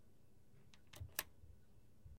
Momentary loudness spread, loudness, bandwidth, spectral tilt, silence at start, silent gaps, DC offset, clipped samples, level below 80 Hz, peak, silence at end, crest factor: 21 LU; -49 LUFS; 16 kHz; -2 dB/octave; 0 s; none; under 0.1%; under 0.1%; -70 dBFS; -22 dBFS; 0 s; 34 dB